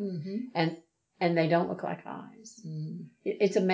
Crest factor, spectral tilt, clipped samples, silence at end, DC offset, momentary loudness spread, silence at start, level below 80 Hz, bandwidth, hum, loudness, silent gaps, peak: 18 dB; -6.5 dB/octave; under 0.1%; 0 s; under 0.1%; 17 LU; 0 s; -80 dBFS; 8 kHz; none; -31 LUFS; none; -12 dBFS